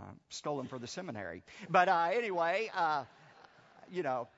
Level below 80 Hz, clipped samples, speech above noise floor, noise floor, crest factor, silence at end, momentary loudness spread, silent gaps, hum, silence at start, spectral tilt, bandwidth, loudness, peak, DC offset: -78 dBFS; under 0.1%; 26 dB; -60 dBFS; 22 dB; 0.1 s; 16 LU; none; none; 0 s; -3 dB/octave; 7.6 kHz; -34 LUFS; -12 dBFS; under 0.1%